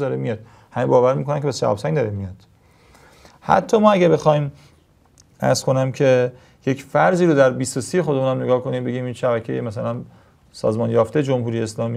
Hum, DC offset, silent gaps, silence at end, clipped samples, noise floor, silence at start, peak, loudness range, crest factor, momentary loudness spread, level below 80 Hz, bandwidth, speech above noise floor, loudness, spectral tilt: none; under 0.1%; none; 0 s; under 0.1%; -54 dBFS; 0 s; 0 dBFS; 4 LU; 20 dB; 12 LU; -58 dBFS; 14 kHz; 36 dB; -19 LUFS; -6.5 dB/octave